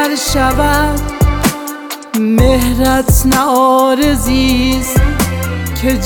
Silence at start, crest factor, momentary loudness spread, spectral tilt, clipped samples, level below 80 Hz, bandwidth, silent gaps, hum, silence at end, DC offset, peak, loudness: 0 s; 12 dB; 7 LU; -5 dB/octave; under 0.1%; -18 dBFS; over 20 kHz; none; none; 0 s; under 0.1%; 0 dBFS; -12 LUFS